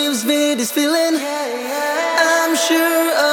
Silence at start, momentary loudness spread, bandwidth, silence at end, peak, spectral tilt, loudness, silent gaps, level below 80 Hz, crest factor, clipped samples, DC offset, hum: 0 s; 7 LU; over 20 kHz; 0 s; -2 dBFS; -1 dB/octave; -16 LUFS; none; -80 dBFS; 14 dB; under 0.1%; under 0.1%; none